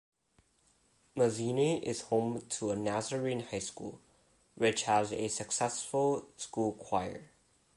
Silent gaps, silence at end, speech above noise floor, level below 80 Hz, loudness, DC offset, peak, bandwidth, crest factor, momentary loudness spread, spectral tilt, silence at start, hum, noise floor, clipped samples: none; 0.5 s; 38 dB; -68 dBFS; -33 LUFS; under 0.1%; -16 dBFS; 11.5 kHz; 20 dB; 10 LU; -4 dB/octave; 1.15 s; none; -71 dBFS; under 0.1%